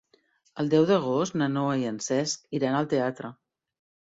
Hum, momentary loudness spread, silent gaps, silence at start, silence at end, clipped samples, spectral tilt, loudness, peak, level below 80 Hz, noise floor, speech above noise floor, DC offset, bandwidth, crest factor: none; 10 LU; none; 0.55 s; 0.8 s; under 0.1%; -5.5 dB/octave; -26 LUFS; -10 dBFS; -70 dBFS; -66 dBFS; 40 dB; under 0.1%; 7.8 kHz; 18 dB